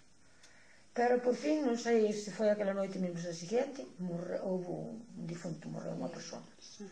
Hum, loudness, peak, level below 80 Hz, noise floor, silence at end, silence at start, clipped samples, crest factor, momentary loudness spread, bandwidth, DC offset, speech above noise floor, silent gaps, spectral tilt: none; -36 LUFS; -20 dBFS; -76 dBFS; -64 dBFS; 0 s; 0.45 s; under 0.1%; 16 dB; 15 LU; 10 kHz; under 0.1%; 29 dB; none; -5.5 dB/octave